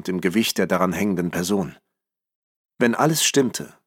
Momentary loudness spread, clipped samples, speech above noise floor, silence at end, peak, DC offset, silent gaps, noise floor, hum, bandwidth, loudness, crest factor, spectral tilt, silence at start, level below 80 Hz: 7 LU; under 0.1%; 61 dB; 0.2 s; -4 dBFS; under 0.1%; 2.35-2.69 s; -82 dBFS; none; 17 kHz; -21 LUFS; 20 dB; -4 dB/octave; 0.05 s; -60 dBFS